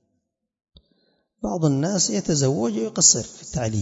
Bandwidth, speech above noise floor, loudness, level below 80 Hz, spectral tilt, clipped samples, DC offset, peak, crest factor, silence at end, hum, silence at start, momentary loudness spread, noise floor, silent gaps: 8 kHz; 55 dB; -20 LUFS; -50 dBFS; -4 dB/octave; under 0.1%; under 0.1%; -2 dBFS; 20 dB; 0 s; none; 1.4 s; 13 LU; -76 dBFS; none